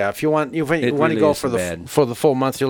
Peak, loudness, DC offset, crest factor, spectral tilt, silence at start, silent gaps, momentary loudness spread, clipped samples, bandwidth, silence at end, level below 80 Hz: -2 dBFS; -19 LUFS; under 0.1%; 16 dB; -5.5 dB/octave; 0 s; none; 5 LU; under 0.1%; 19.5 kHz; 0 s; -50 dBFS